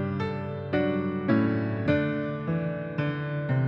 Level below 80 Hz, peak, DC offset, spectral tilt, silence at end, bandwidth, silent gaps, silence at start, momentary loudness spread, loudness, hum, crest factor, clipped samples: -58 dBFS; -10 dBFS; under 0.1%; -9.5 dB/octave; 0 s; 5.8 kHz; none; 0 s; 6 LU; -28 LUFS; none; 16 dB; under 0.1%